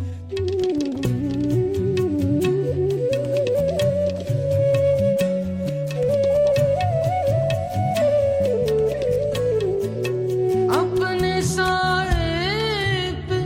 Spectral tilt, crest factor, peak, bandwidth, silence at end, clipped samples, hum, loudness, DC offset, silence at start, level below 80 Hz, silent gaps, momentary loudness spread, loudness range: -6 dB/octave; 14 dB; -8 dBFS; 16.5 kHz; 0 s; under 0.1%; none; -21 LUFS; under 0.1%; 0 s; -38 dBFS; none; 5 LU; 1 LU